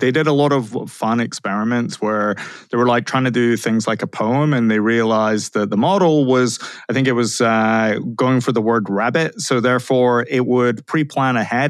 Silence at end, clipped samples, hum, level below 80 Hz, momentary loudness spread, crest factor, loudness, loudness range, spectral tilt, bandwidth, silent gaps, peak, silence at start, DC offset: 0 s; under 0.1%; none; -70 dBFS; 6 LU; 14 dB; -17 LUFS; 2 LU; -5.5 dB/octave; 13 kHz; none; -4 dBFS; 0 s; under 0.1%